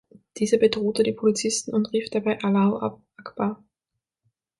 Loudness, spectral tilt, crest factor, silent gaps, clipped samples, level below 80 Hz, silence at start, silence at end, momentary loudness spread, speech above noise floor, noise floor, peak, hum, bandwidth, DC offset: -24 LUFS; -5 dB/octave; 18 dB; none; under 0.1%; -64 dBFS; 0.35 s; 1.05 s; 10 LU; 61 dB; -84 dBFS; -6 dBFS; none; 11.5 kHz; under 0.1%